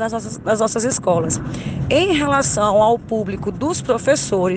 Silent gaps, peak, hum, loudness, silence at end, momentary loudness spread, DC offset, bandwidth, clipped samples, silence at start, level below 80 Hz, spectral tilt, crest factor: none; -4 dBFS; none; -18 LUFS; 0 s; 8 LU; under 0.1%; 10 kHz; under 0.1%; 0 s; -42 dBFS; -4.5 dB/octave; 14 dB